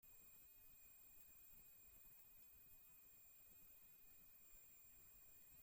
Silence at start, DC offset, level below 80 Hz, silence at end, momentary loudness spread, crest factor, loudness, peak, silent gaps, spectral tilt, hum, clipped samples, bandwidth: 0 s; under 0.1%; -82 dBFS; 0 s; 1 LU; 14 dB; -64 LUFS; -52 dBFS; none; -1.5 dB/octave; none; under 0.1%; 17 kHz